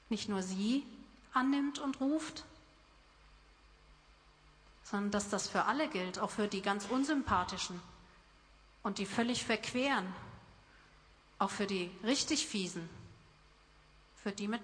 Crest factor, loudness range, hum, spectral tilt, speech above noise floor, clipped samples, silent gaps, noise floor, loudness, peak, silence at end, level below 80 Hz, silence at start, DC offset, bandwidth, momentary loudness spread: 20 dB; 5 LU; none; -3.5 dB/octave; 28 dB; under 0.1%; none; -64 dBFS; -36 LUFS; -18 dBFS; 0 s; -64 dBFS; 0.1 s; under 0.1%; 10.5 kHz; 17 LU